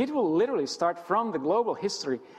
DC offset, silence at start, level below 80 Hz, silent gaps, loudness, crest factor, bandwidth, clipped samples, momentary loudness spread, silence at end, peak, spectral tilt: under 0.1%; 0 s; -72 dBFS; none; -27 LUFS; 14 dB; 12 kHz; under 0.1%; 5 LU; 0 s; -14 dBFS; -4.5 dB/octave